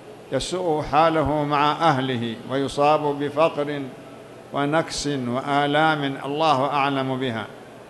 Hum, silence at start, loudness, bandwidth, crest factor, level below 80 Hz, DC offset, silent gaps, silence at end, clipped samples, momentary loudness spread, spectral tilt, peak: none; 0 s; -22 LUFS; 12 kHz; 18 dB; -50 dBFS; under 0.1%; none; 0 s; under 0.1%; 12 LU; -5 dB/octave; -4 dBFS